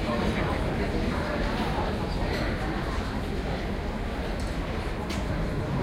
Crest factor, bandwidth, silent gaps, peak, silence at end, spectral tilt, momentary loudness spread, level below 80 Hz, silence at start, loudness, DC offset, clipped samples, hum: 14 dB; 15.5 kHz; none; -14 dBFS; 0 s; -6.5 dB/octave; 4 LU; -34 dBFS; 0 s; -30 LUFS; under 0.1%; under 0.1%; none